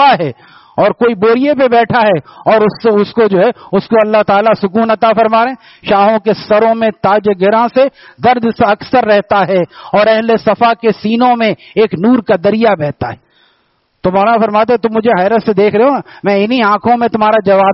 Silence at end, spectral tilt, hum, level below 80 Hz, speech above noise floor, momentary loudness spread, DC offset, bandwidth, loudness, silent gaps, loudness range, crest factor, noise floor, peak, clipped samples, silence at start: 0 s; -4 dB/octave; none; -50 dBFS; 48 dB; 5 LU; under 0.1%; 5.8 kHz; -11 LUFS; none; 2 LU; 10 dB; -58 dBFS; 0 dBFS; under 0.1%; 0 s